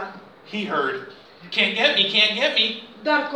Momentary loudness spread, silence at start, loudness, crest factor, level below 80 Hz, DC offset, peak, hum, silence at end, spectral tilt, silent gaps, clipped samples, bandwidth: 15 LU; 0 s; -20 LUFS; 20 dB; -74 dBFS; under 0.1%; -2 dBFS; none; 0 s; -3 dB/octave; none; under 0.1%; 11.5 kHz